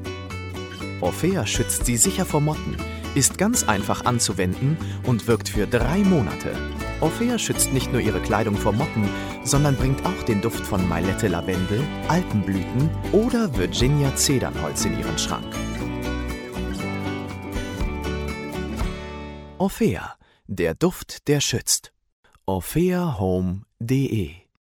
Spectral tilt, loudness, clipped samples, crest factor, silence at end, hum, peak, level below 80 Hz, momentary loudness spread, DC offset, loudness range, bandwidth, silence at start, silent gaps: -4.5 dB/octave; -23 LUFS; under 0.1%; 20 dB; 0.25 s; none; -4 dBFS; -36 dBFS; 10 LU; under 0.1%; 7 LU; 18 kHz; 0 s; 22.12-22.23 s